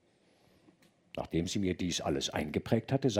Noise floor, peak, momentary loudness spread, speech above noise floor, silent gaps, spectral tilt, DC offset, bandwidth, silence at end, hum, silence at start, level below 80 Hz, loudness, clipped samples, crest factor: -68 dBFS; -14 dBFS; 5 LU; 35 dB; none; -5 dB/octave; under 0.1%; 16 kHz; 0 s; none; 1.15 s; -58 dBFS; -33 LUFS; under 0.1%; 20 dB